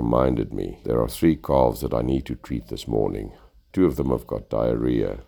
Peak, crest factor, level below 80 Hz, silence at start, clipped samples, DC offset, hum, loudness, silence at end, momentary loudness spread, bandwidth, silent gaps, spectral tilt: -4 dBFS; 20 dB; -36 dBFS; 0 s; under 0.1%; under 0.1%; none; -24 LUFS; 0.05 s; 10 LU; over 20 kHz; none; -7.5 dB/octave